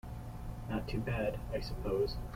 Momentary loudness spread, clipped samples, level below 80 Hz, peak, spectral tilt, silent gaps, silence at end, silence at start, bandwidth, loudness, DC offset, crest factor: 11 LU; under 0.1%; -44 dBFS; -22 dBFS; -7 dB/octave; none; 0 s; 0.05 s; 16.5 kHz; -38 LUFS; under 0.1%; 14 dB